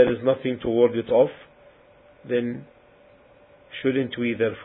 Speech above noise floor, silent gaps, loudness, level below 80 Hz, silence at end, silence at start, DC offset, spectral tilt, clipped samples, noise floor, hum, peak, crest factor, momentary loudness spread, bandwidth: 31 dB; none; -23 LUFS; -58 dBFS; 0 s; 0 s; under 0.1%; -11 dB/octave; under 0.1%; -54 dBFS; none; -4 dBFS; 20 dB; 9 LU; 4 kHz